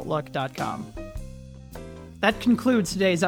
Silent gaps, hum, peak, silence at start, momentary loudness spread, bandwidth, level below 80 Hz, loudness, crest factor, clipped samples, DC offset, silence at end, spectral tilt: none; none; -6 dBFS; 0 s; 21 LU; 17 kHz; -44 dBFS; -25 LUFS; 20 dB; under 0.1%; under 0.1%; 0 s; -5 dB/octave